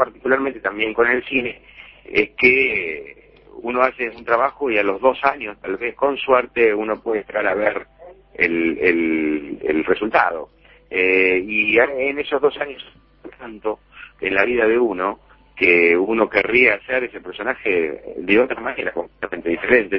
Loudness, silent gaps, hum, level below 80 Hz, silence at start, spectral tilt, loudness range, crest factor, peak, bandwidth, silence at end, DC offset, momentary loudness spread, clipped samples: -19 LUFS; none; none; -52 dBFS; 0 s; -7.5 dB/octave; 4 LU; 20 dB; 0 dBFS; 6 kHz; 0 s; under 0.1%; 13 LU; under 0.1%